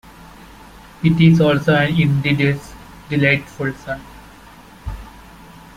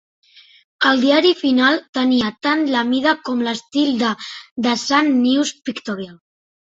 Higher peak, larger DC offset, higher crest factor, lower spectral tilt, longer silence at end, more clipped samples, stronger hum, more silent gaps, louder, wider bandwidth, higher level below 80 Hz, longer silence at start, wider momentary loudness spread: about the same, -2 dBFS vs -2 dBFS; neither; about the same, 18 dB vs 16 dB; first, -7.5 dB/octave vs -3.5 dB/octave; about the same, 0.65 s vs 0.55 s; neither; neither; second, none vs 1.89-1.93 s, 4.51-4.56 s; about the same, -16 LUFS vs -17 LUFS; first, 12 kHz vs 8 kHz; first, -42 dBFS vs -62 dBFS; first, 1 s vs 0.8 s; first, 21 LU vs 13 LU